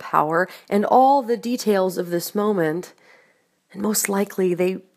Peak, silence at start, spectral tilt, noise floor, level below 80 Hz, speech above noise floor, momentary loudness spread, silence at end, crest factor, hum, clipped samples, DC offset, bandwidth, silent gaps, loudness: -2 dBFS; 0 s; -4.5 dB/octave; -62 dBFS; -74 dBFS; 41 dB; 9 LU; 0.15 s; 20 dB; none; under 0.1%; under 0.1%; 15.5 kHz; none; -21 LUFS